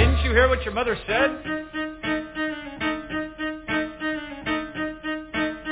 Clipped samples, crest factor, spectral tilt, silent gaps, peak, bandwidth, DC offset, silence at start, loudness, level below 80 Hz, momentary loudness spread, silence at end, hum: under 0.1%; 20 dB; -9.5 dB/octave; none; -4 dBFS; 4 kHz; under 0.1%; 0 s; -25 LUFS; -32 dBFS; 11 LU; 0 s; none